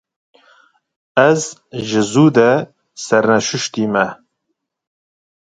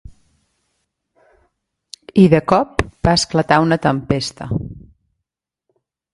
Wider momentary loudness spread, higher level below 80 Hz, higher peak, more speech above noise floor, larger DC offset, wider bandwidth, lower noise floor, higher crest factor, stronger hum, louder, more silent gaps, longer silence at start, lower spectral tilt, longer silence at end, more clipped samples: about the same, 13 LU vs 13 LU; second, -60 dBFS vs -40 dBFS; about the same, 0 dBFS vs 0 dBFS; second, 59 dB vs 65 dB; neither; second, 9.4 kHz vs 11.5 kHz; second, -74 dBFS vs -81 dBFS; about the same, 18 dB vs 20 dB; neither; about the same, -15 LUFS vs -16 LUFS; neither; second, 1.15 s vs 2.15 s; about the same, -5 dB/octave vs -5.5 dB/octave; about the same, 1.45 s vs 1.35 s; neither